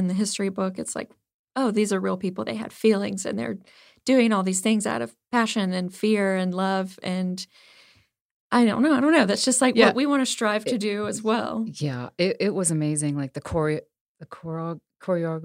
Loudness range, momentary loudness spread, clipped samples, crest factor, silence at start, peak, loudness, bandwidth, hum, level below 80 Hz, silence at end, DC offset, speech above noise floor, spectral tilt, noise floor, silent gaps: 6 LU; 13 LU; under 0.1%; 24 dB; 0 s; -2 dBFS; -24 LUFS; 16 kHz; none; -62 dBFS; 0 s; under 0.1%; 37 dB; -4.5 dB/octave; -61 dBFS; 1.34-1.44 s, 8.21-8.50 s, 14.01-14.15 s